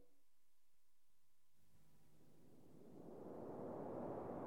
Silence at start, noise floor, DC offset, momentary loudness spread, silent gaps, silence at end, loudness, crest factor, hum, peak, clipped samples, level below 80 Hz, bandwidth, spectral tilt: 0 s; -87 dBFS; under 0.1%; 17 LU; none; 0 s; -52 LUFS; 18 dB; none; -38 dBFS; under 0.1%; -80 dBFS; 17.5 kHz; -8.5 dB/octave